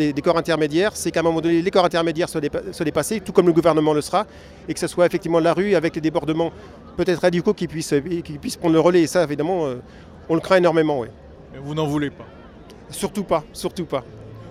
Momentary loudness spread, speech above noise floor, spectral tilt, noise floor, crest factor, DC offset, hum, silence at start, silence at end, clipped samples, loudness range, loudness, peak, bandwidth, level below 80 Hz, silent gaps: 13 LU; 22 dB; -5.5 dB/octave; -42 dBFS; 18 dB; under 0.1%; none; 0 s; 0 s; under 0.1%; 3 LU; -20 LUFS; -2 dBFS; 15 kHz; -48 dBFS; none